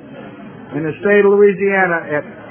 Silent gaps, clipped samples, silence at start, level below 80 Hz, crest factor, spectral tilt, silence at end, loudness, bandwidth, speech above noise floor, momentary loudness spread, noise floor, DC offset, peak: none; under 0.1%; 0.05 s; -56 dBFS; 14 dB; -10.5 dB/octave; 0 s; -14 LUFS; 3.4 kHz; 20 dB; 23 LU; -34 dBFS; under 0.1%; 0 dBFS